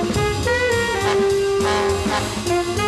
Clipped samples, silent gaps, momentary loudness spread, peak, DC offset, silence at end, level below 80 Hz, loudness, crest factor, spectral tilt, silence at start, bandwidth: under 0.1%; none; 3 LU; -6 dBFS; under 0.1%; 0 s; -36 dBFS; -19 LUFS; 12 dB; -4.5 dB/octave; 0 s; 13.5 kHz